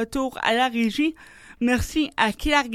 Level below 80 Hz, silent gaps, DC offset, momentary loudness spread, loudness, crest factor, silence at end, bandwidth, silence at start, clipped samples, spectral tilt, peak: -40 dBFS; none; under 0.1%; 5 LU; -23 LUFS; 18 dB; 0 s; 15.5 kHz; 0 s; under 0.1%; -4 dB/octave; -4 dBFS